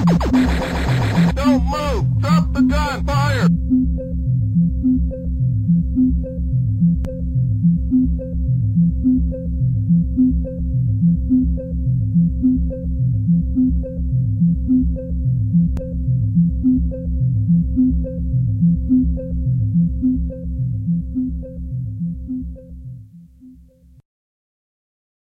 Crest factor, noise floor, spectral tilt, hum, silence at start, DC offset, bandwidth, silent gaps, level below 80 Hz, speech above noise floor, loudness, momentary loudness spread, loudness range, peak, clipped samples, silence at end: 12 dB; -47 dBFS; -8.5 dB/octave; none; 0 s; under 0.1%; 8.6 kHz; none; -24 dBFS; 31 dB; -18 LUFS; 7 LU; 7 LU; -6 dBFS; under 0.1%; 1.8 s